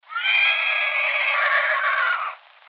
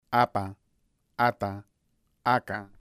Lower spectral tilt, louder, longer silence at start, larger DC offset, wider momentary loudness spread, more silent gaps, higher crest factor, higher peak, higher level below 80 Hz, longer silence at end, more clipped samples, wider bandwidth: second, 13.5 dB/octave vs -6.5 dB/octave; first, -19 LUFS vs -28 LUFS; about the same, 0.1 s vs 0.1 s; neither; second, 6 LU vs 15 LU; neither; second, 14 dB vs 22 dB; about the same, -10 dBFS vs -8 dBFS; second, under -90 dBFS vs -64 dBFS; first, 0.35 s vs 0.15 s; neither; second, 6 kHz vs 15.5 kHz